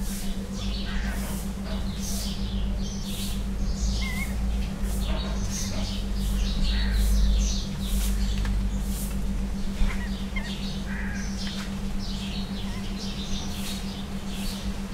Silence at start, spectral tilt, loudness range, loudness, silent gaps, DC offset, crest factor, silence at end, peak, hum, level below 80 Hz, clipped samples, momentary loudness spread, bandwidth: 0 s; -4.5 dB/octave; 4 LU; -30 LUFS; none; under 0.1%; 16 dB; 0 s; -10 dBFS; none; -28 dBFS; under 0.1%; 6 LU; 16 kHz